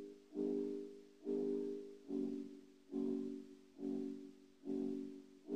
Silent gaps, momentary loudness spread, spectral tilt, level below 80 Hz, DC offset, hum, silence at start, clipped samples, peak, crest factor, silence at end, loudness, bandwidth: none; 13 LU; -8 dB/octave; -84 dBFS; under 0.1%; none; 0 s; under 0.1%; -30 dBFS; 14 dB; 0 s; -45 LUFS; 9.4 kHz